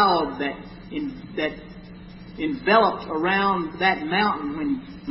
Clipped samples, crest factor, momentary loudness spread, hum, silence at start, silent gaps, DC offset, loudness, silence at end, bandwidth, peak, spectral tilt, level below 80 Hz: under 0.1%; 18 dB; 21 LU; none; 0 s; none; under 0.1%; -23 LUFS; 0 s; 5.8 kHz; -6 dBFS; -9.5 dB/octave; -50 dBFS